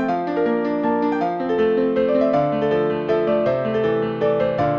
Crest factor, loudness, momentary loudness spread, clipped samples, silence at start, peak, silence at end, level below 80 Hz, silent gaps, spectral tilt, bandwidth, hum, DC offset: 12 dB; -20 LUFS; 3 LU; under 0.1%; 0 s; -6 dBFS; 0 s; -52 dBFS; none; -8.5 dB/octave; 6.4 kHz; none; under 0.1%